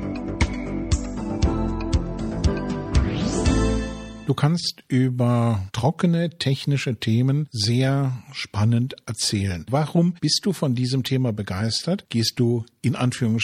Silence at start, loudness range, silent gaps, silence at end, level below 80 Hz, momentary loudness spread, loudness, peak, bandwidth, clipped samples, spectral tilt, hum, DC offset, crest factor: 0 s; 2 LU; none; 0 s; -32 dBFS; 6 LU; -23 LUFS; -6 dBFS; 15 kHz; under 0.1%; -5.5 dB/octave; none; under 0.1%; 16 dB